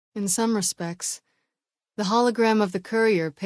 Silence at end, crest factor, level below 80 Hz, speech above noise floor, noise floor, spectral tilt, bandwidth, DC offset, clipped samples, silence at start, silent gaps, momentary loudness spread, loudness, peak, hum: 0 s; 16 dB; -72 dBFS; 65 dB; -88 dBFS; -4 dB/octave; 11 kHz; under 0.1%; under 0.1%; 0.15 s; none; 10 LU; -23 LUFS; -8 dBFS; none